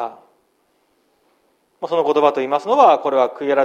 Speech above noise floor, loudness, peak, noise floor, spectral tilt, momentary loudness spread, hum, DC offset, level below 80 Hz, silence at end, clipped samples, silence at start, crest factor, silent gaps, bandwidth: 47 dB; -16 LUFS; 0 dBFS; -63 dBFS; -5 dB/octave; 11 LU; none; under 0.1%; -72 dBFS; 0 s; under 0.1%; 0 s; 18 dB; none; 9.2 kHz